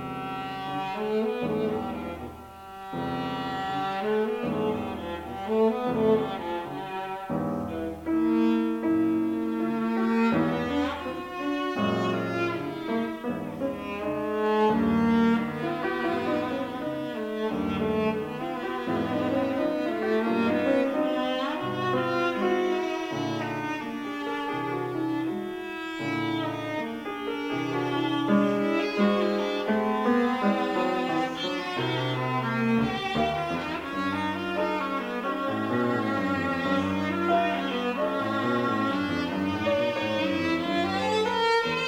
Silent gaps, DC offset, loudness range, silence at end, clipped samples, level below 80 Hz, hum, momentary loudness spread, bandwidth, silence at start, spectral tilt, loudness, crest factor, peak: none; under 0.1%; 5 LU; 0 s; under 0.1%; -56 dBFS; none; 8 LU; 16 kHz; 0 s; -6.5 dB/octave; -27 LUFS; 16 dB; -12 dBFS